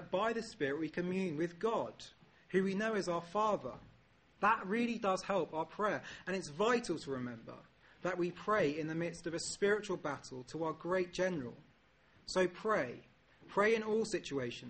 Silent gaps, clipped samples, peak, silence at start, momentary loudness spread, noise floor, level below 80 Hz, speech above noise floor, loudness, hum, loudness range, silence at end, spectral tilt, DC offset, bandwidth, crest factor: none; under 0.1%; -18 dBFS; 0 s; 12 LU; -68 dBFS; -68 dBFS; 32 dB; -37 LUFS; none; 2 LU; 0 s; -5 dB/octave; under 0.1%; 8.4 kHz; 18 dB